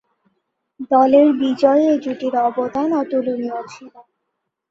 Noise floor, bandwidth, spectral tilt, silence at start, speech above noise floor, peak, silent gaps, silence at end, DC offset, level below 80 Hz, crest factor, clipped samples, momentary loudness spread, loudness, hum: -76 dBFS; 7.6 kHz; -6 dB/octave; 0.8 s; 60 dB; -2 dBFS; none; 0.7 s; under 0.1%; -64 dBFS; 16 dB; under 0.1%; 14 LU; -17 LUFS; none